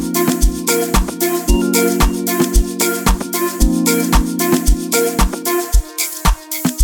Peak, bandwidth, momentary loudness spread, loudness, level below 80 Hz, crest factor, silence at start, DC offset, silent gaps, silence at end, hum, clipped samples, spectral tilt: 0 dBFS; 19.5 kHz; 4 LU; -16 LUFS; -18 dBFS; 14 dB; 0 s; 0.2%; none; 0 s; none; under 0.1%; -4 dB/octave